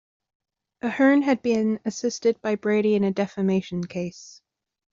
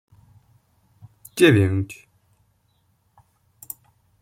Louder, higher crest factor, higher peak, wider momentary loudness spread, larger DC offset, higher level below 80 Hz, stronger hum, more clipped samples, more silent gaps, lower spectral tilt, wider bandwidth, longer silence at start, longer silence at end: second, -23 LUFS vs -19 LUFS; second, 16 dB vs 22 dB; second, -8 dBFS vs -2 dBFS; second, 12 LU vs 23 LU; neither; second, -66 dBFS vs -60 dBFS; neither; neither; neither; about the same, -6 dB/octave vs -6 dB/octave; second, 7.6 kHz vs 16.5 kHz; second, 0.85 s vs 1.35 s; second, 0.6 s vs 2.3 s